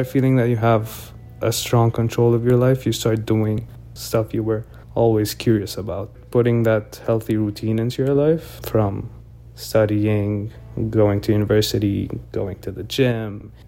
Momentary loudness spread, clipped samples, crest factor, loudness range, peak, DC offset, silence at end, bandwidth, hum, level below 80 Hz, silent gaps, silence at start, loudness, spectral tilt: 11 LU; under 0.1%; 16 dB; 2 LU; -4 dBFS; under 0.1%; 0 s; 16.5 kHz; none; -44 dBFS; none; 0 s; -20 LUFS; -6.5 dB/octave